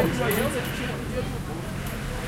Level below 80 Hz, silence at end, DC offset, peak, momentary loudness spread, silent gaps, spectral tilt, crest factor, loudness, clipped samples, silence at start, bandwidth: -38 dBFS; 0 s; under 0.1%; -10 dBFS; 8 LU; none; -5 dB/octave; 18 dB; -28 LUFS; under 0.1%; 0 s; 16.5 kHz